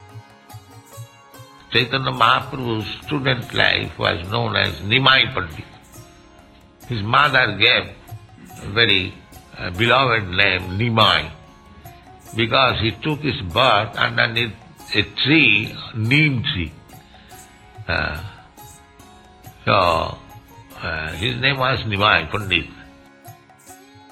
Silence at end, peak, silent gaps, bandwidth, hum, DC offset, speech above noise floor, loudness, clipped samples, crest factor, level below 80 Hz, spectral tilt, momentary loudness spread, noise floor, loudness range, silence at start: 0.35 s; 0 dBFS; none; 16 kHz; none; under 0.1%; 29 dB; -18 LUFS; under 0.1%; 20 dB; -44 dBFS; -5 dB/octave; 15 LU; -47 dBFS; 6 LU; 0 s